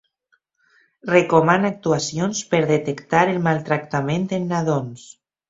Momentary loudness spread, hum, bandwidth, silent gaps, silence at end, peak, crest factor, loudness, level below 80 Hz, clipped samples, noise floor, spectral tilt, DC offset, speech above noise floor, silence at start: 8 LU; none; 8 kHz; none; 0.4 s; -2 dBFS; 20 dB; -20 LUFS; -58 dBFS; under 0.1%; -67 dBFS; -5.5 dB/octave; under 0.1%; 47 dB; 1.05 s